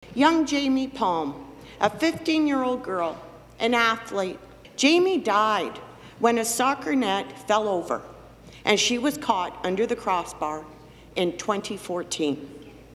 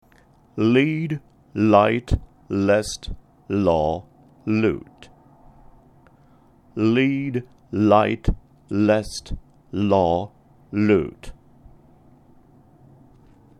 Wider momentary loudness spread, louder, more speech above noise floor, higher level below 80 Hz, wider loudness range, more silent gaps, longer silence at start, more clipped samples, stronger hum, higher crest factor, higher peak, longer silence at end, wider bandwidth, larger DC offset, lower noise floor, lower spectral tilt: second, 13 LU vs 17 LU; second, -24 LUFS vs -21 LUFS; second, 22 dB vs 35 dB; second, -58 dBFS vs -38 dBFS; about the same, 4 LU vs 5 LU; neither; second, 0 s vs 0.55 s; neither; neither; about the same, 20 dB vs 22 dB; about the same, -4 dBFS vs -2 dBFS; second, 0.05 s vs 2.3 s; first, 15.5 kHz vs 12.5 kHz; neither; second, -46 dBFS vs -55 dBFS; second, -3 dB/octave vs -6.5 dB/octave